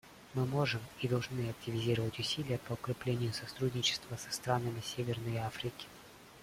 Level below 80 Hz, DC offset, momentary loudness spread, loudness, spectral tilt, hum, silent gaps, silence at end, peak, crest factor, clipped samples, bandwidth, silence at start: -64 dBFS; under 0.1%; 8 LU; -36 LUFS; -5 dB/octave; none; none; 0 s; -18 dBFS; 20 dB; under 0.1%; 16.5 kHz; 0.05 s